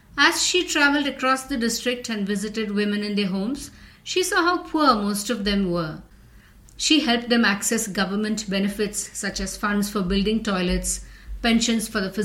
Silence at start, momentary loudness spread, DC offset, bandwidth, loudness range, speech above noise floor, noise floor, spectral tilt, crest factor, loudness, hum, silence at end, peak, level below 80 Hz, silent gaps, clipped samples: 0.15 s; 9 LU; under 0.1%; 16.5 kHz; 3 LU; 27 dB; -49 dBFS; -3.5 dB/octave; 20 dB; -22 LUFS; none; 0 s; -2 dBFS; -42 dBFS; none; under 0.1%